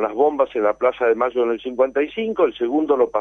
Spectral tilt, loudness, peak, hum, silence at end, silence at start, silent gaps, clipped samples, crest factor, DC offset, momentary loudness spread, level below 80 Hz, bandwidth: -6.5 dB/octave; -20 LUFS; -4 dBFS; none; 0 s; 0 s; none; under 0.1%; 14 dB; under 0.1%; 4 LU; -58 dBFS; 6.4 kHz